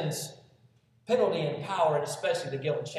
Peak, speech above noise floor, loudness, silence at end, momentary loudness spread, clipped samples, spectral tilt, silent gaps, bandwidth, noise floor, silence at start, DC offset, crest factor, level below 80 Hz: -14 dBFS; 34 dB; -29 LUFS; 0 s; 10 LU; under 0.1%; -4.5 dB/octave; none; 14.5 kHz; -64 dBFS; 0 s; under 0.1%; 18 dB; -76 dBFS